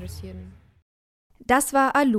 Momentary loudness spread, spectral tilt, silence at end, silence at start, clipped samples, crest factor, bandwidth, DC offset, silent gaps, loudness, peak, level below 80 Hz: 21 LU; -4 dB/octave; 0 s; 0 s; under 0.1%; 20 dB; 16 kHz; under 0.1%; 0.82-1.30 s; -21 LUFS; -6 dBFS; -48 dBFS